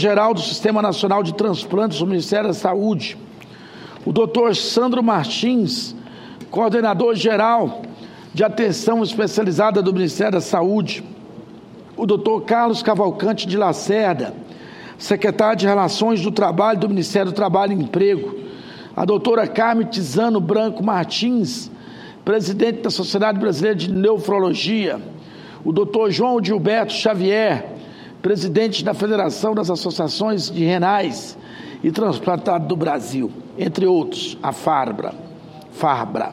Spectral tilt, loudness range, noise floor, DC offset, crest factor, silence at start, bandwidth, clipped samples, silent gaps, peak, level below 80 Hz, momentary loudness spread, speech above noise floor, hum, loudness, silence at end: -5.5 dB/octave; 2 LU; -40 dBFS; under 0.1%; 18 dB; 0 s; 14.5 kHz; under 0.1%; none; 0 dBFS; -64 dBFS; 17 LU; 22 dB; none; -19 LUFS; 0 s